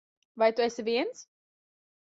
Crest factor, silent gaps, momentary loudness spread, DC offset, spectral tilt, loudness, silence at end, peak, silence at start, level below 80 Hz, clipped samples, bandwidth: 20 dB; none; 11 LU; under 0.1%; -3.5 dB/octave; -29 LUFS; 0.9 s; -12 dBFS; 0.35 s; -78 dBFS; under 0.1%; 7.8 kHz